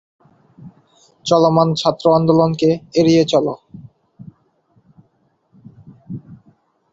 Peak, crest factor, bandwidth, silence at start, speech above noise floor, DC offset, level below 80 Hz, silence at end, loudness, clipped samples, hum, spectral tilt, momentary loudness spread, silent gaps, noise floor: -2 dBFS; 18 dB; 8 kHz; 0.65 s; 48 dB; under 0.1%; -56 dBFS; 0.6 s; -15 LUFS; under 0.1%; none; -6.5 dB/octave; 21 LU; none; -62 dBFS